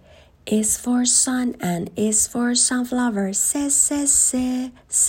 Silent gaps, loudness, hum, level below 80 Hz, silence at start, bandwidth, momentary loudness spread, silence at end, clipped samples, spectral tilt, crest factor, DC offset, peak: none; -19 LUFS; none; -52 dBFS; 0.45 s; 16.5 kHz; 9 LU; 0 s; under 0.1%; -2.5 dB/octave; 16 dB; under 0.1%; -4 dBFS